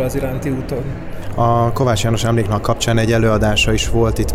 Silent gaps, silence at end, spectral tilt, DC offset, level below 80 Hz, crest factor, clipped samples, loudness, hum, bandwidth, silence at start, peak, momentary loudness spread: none; 0 s; -5.5 dB/octave; under 0.1%; -26 dBFS; 12 dB; under 0.1%; -16 LUFS; none; 16 kHz; 0 s; -4 dBFS; 10 LU